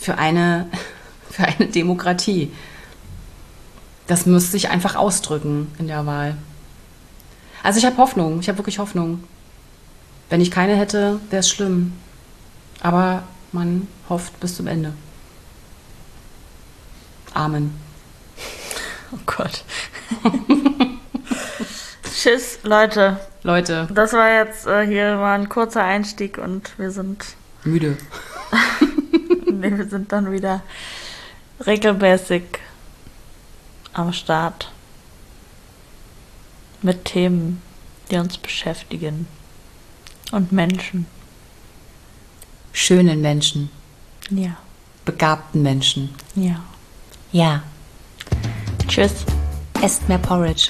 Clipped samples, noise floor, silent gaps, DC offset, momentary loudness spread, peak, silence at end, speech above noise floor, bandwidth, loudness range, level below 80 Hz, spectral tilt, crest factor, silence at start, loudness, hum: under 0.1%; -45 dBFS; none; under 0.1%; 16 LU; -2 dBFS; 0 s; 26 dB; 13.5 kHz; 9 LU; -38 dBFS; -4.5 dB/octave; 20 dB; 0 s; -19 LUFS; none